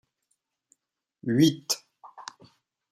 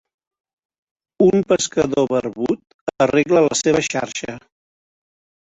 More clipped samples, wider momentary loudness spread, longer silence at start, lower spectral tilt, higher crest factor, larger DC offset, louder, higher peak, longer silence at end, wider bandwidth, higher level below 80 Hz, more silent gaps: neither; first, 22 LU vs 13 LU; about the same, 1.25 s vs 1.2 s; about the same, -4.5 dB/octave vs -4.5 dB/octave; about the same, 22 dB vs 18 dB; neither; second, -26 LUFS vs -18 LUFS; second, -8 dBFS vs -2 dBFS; second, 0.7 s vs 1.1 s; first, 16 kHz vs 8.4 kHz; second, -70 dBFS vs -54 dBFS; second, none vs 2.74-2.87 s